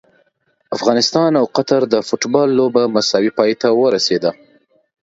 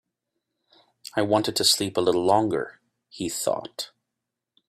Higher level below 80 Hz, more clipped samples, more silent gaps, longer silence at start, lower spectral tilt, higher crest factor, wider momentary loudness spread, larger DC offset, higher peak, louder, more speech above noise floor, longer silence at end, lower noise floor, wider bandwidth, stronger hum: about the same, -62 dBFS vs -66 dBFS; neither; neither; second, 0.7 s vs 1.15 s; first, -4.5 dB/octave vs -3 dB/octave; second, 16 dB vs 22 dB; second, 4 LU vs 16 LU; neither; first, 0 dBFS vs -6 dBFS; first, -15 LUFS vs -23 LUFS; second, 47 dB vs 61 dB; about the same, 0.7 s vs 0.8 s; second, -62 dBFS vs -85 dBFS; second, 7.8 kHz vs 16 kHz; neither